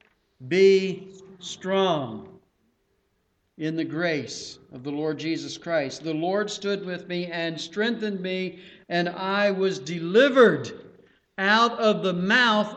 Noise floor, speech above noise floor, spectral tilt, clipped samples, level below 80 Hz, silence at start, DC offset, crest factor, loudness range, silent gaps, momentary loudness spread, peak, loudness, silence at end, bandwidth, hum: -71 dBFS; 47 dB; -5 dB/octave; under 0.1%; -70 dBFS; 0.4 s; under 0.1%; 22 dB; 9 LU; none; 16 LU; -4 dBFS; -24 LUFS; 0 s; 8.6 kHz; none